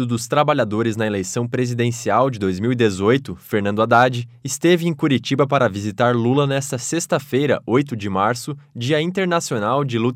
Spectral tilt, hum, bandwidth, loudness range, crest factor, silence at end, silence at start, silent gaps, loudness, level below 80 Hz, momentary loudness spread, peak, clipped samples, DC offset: -5.5 dB/octave; none; 16 kHz; 2 LU; 16 dB; 0 s; 0 s; none; -19 LUFS; -60 dBFS; 6 LU; -2 dBFS; under 0.1%; under 0.1%